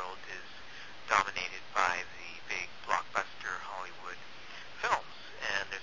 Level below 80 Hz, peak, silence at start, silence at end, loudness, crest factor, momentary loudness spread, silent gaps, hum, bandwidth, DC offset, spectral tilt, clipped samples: -66 dBFS; -8 dBFS; 0 s; 0 s; -35 LUFS; 28 dB; 16 LU; none; none; 7.6 kHz; 0.5%; -1.5 dB/octave; under 0.1%